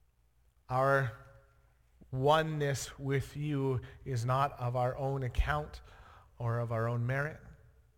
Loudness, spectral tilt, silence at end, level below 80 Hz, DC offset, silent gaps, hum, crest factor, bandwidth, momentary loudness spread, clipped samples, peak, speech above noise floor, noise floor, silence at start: -33 LUFS; -6 dB/octave; 0.4 s; -48 dBFS; under 0.1%; none; none; 20 dB; 17 kHz; 11 LU; under 0.1%; -14 dBFS; 37 dB; -69 dBFS; 0.7 s